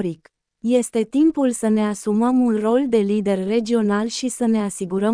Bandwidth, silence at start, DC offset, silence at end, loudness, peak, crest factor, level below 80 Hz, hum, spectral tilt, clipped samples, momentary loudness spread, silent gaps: 10.5 kHz; 0 s; under 0.1%; 0 s; -20 LUFS; -6 dBFS; 14 dB; -58 dBFS; none; -5.5 dB/octave; under 0.1%; 5 LU; none